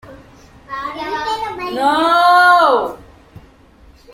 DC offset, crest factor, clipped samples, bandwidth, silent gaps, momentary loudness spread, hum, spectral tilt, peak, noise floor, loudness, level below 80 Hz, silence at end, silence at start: under 0.1%; 16 dB; under 0.1%; 16.5 kHz; none; 17 LU; none; -3.5 dB/octave; -2 dBFS; -46 dBFS; -14 LUFS; -48 dBFS; 1.1 s; 0.05 s